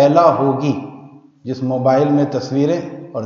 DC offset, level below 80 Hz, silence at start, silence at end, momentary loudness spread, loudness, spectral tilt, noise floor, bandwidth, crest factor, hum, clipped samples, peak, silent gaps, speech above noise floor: under 0.1%; -66 dBFS; 0 s; 0 s; 15 LU; -16 LUFS; -8 dB/octave; -40 dBFS; 7 kHz; 16 dB; none; under 0.1%; 0 dBFS; none; 25 dB